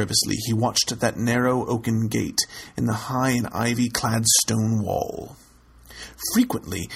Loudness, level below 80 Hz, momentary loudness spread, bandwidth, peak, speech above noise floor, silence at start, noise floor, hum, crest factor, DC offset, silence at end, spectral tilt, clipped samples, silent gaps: -22 LUFS; -50 dBFS; 11 LU; 16 kHz; -2 dBFS; 26 dB; 0 s; -49 dBFS; none; 20 dB; under 0.1%; 0 s; -4 dB/octave; under 0.1%; none